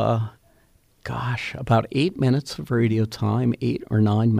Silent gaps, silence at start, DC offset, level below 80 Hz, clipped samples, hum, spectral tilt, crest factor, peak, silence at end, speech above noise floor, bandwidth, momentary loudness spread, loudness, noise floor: none; 0 s; under 0.1%; -52 dBFS; under 0.1%; none; -7.5 dB/octave; 16 dB; -6 dBFS; 0 s; 38 dB; 10.5 kHz; 8 LU; -23 LUFS; -59 dBFS